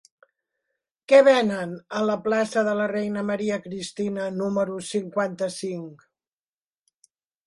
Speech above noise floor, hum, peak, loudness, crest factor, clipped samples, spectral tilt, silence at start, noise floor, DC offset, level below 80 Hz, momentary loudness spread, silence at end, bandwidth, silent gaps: over 67 dB; none; -2 dBFS; -24 LUFS; 22 dB; under 0.1%; -5 dB/octave; 1.1 s; under -90 dBFS; under 0.1%; -70 dBFS; 14 LU; 1.5 s; 11.5 kHz; none